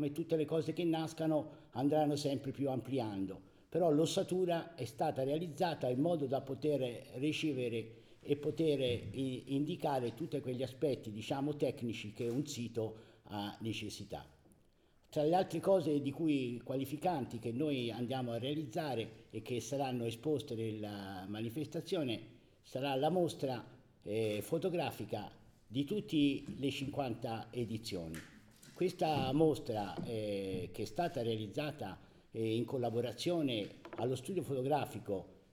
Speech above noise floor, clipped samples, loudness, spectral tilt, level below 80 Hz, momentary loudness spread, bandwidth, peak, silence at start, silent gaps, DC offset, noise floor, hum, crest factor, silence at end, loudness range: 32 dB; under 0.1%; -38 LUFS; -6 dB/octave; -68 dBFS; 10 LU; 18.5 kHz; -18 dBFS; 0 s; none; under 0.1%; -69 dBFS; none; 20 dB; 0.15 s; 4 LU